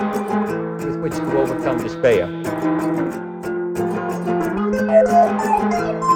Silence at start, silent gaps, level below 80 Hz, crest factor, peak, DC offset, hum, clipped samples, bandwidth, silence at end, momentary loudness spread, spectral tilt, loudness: 0 s; none; -48 dBFS; 16 dB; -2 dBFS; under 0.1%; none; under 0.1%; 17.5 kHz; 0 s; 9 LU; -7 dB/octave; -19 LUFS